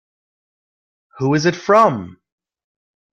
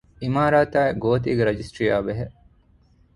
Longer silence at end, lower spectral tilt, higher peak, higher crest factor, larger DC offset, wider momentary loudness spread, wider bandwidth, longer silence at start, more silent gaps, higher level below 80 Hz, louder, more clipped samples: first, 1 s vs 0.85 s; second, -6 dB/octave vs -7.5 dB/octave; about the same, -2 dBFS vs -4 dBFS; about the same, 18 dB vs 18 dB; neither; about the same, 10 LU vs 10 LU; second, 9.6 kHz vs 11.5 kHz; first, 1.15 s vs 0.2 s; neither; second, -60 dBFS vs -46 dBFS; first, -16 LUFS vs -22 LUFS; neither